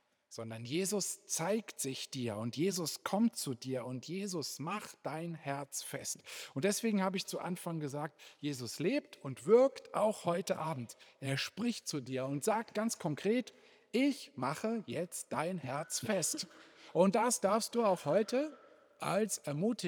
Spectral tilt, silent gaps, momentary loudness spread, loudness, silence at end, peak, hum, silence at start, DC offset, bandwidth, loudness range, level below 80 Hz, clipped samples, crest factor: -4.5 dB/octave; none; 11 LU; -36 LUFS; 0 s; -14 dBFS; none; 0.3 s; under 0.1%; over 20 kHz; 4 LU; -88 dBFS; under 0.1%; 22 dB